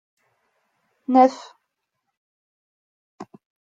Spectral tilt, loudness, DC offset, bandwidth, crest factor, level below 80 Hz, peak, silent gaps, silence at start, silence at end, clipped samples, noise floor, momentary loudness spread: -5 dB/octave; -18 LUFS; under 0.1%; 7.6 kHz; 24 dB; -80 dBFS; -2 dBFS; 2.17-3.19 s; 1.1 s; 0.5 s; under 0.1%; -79 dBFS; 27 LU